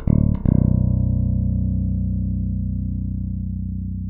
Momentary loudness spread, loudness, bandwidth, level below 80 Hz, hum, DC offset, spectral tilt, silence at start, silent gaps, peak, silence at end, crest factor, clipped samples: 9 LU; -22 LUFS; 2.2 kHz; -26 dBFS; 60 Hz at -55 dBFS; under 0.1%; -15 dB/octave; 0 s; none; -2 dBFS; 0 s; 18 dB; under 0.1%